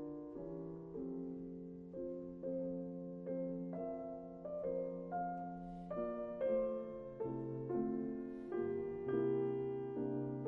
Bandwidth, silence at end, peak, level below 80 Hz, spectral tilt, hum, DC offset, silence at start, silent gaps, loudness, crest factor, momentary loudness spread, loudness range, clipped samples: 3.4 kHz; 0 s; -26 dBFS; -68 dBFS; -9.5 dB/octave; none; under 0.1%; 0 s; none; -43 LUFS; 16 dB; 10 LU; 5 LU; under 0.1%